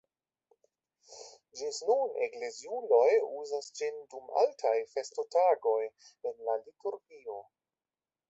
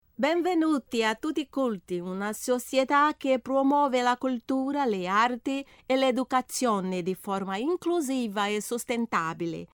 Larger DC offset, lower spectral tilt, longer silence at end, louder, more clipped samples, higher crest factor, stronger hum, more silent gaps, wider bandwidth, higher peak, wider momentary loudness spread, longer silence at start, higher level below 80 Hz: neither; second, -1 dB/octave vs -4.5 dB/octave; first, 0.9 s vs 0.1 s; second, -32 LUFS vs -27 LUFS; neither; about the same, 20 dB vs 16 dB; neither; neither; second, 8.2 kHz vs over 20 kHz; about the same, -14 dBFS vs -12 dBFS; first, 18 LU vs 8 LU; first, 1.1 s vs 0.2 s; second, -84 dBFS vs -68 dBFS